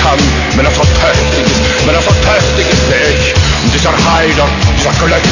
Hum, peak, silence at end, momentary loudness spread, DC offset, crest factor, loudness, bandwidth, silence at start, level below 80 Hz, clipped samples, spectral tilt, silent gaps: none; 0 dBFS; 0 s; 2 LU; under 0.1%; 8 dB; -9 LUFS; 7.4 kHz; 0 s; -16 dBFS; 0.1%; -4.5 dB/octave; none